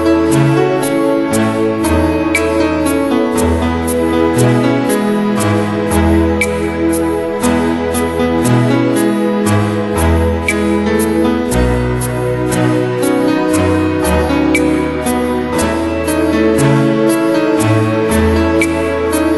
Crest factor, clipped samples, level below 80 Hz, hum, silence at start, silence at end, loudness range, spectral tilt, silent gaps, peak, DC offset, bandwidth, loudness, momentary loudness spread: 12 dB; under 0.1%; -28 dBFS; none; 0 s; 0 s; 1 LU; -6 dB/octave; none; 0 dBFS; under 0.1%; 12 kHz; -13 LUFS; 4 LU